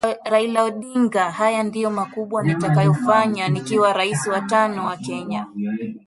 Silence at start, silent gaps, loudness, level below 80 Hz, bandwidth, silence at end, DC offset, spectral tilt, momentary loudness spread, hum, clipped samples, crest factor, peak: 0.05 s; none; -20 LUFS; -62 dBFS; 11.5 kHz; 0.1 s; under 0.1%; -6 dB/octave; 9 LU; none; under 0.1%; 16 dB; -2 dBFS